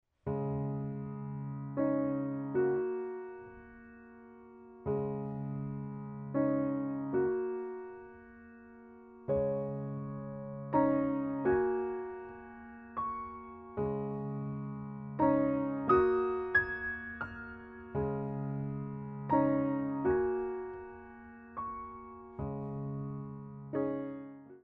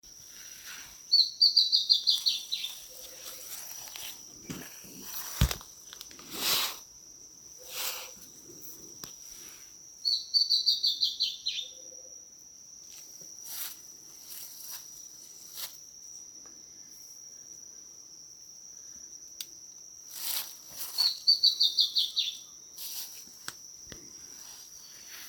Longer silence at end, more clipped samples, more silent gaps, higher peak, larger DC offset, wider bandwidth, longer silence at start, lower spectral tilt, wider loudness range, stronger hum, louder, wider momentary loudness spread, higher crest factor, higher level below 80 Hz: about the same, 0.05 s vs 0 s; neither; neither; second, -14 dBFS vs -8 dBFS; neither; second, 5.4 kHz vs 18 kHz; first, 0.25 s vs 0.05 s; first, -8.5 dB/octave vs -0.5 dB/octave; second, 8 LU vs 18 LU; neither; second, -35 LUFS vs -27 LUFS; second, 20 LU vs 23 LU; second, 20 dB vs 26 dB; second, -60 dBFS vs -52 dBFS